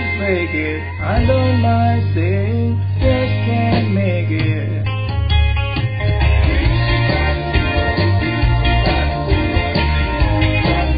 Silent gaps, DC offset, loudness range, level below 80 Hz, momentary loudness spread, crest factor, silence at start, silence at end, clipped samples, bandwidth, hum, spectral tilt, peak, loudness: none; under 0.1%; 1 LU; -20 dBFS; 4 LU; 12 dB; 0 s; 0 s; under 0.1%; 5.2 kHz; none; -12 dB/octave; -2 dBFS; -17 LUFS